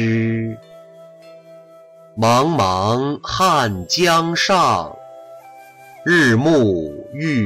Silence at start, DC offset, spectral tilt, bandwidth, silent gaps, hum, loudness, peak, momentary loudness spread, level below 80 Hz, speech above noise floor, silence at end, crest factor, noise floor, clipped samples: 0 s; under 0.1%; -5 dB/octave; 16 kHz; none; none; -16 LUFS; -6 dBFS; 14 LU; -50 dBFS; 28 dB; 0 s; 12 dB; -44 dBFS; under 0.1%